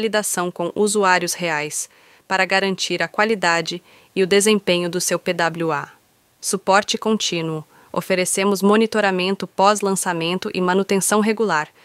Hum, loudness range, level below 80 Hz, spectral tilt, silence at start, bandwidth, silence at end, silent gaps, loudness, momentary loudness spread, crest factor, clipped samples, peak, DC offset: none; 3 LU; -66 dBFS; -3.5 dB/octave; 0 s; 16 kHz; 0.15 s; none; -19 LUFS; 10 LU; 18 dB; under 0.1%; -2 dBFS; under 0.1%